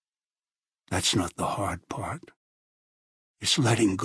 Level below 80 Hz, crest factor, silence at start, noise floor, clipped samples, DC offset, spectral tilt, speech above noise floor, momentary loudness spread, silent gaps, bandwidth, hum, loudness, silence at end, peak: -56 dBFS; 20 dB; 0.9 s; under -90 dBFS; under 0.1%; under 0.1%; -4 dB/octave; over 63 dB; 12 LU; 2.36-3.34 s; 11 kHz; none; -27 LUFS; 0 s; -10 dBFS